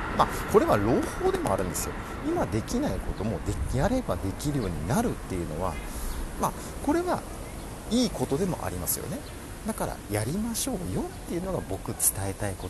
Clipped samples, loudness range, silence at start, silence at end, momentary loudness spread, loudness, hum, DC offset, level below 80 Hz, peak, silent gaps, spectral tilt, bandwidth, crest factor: under 0.1%; 4 LU; 0 s; 0 s; 10 LU; -29 LUFS; none; under 0.1%; -38 dBFS; -6 dBFS; none; -5 dB/octave; 13 kHz; 22 dB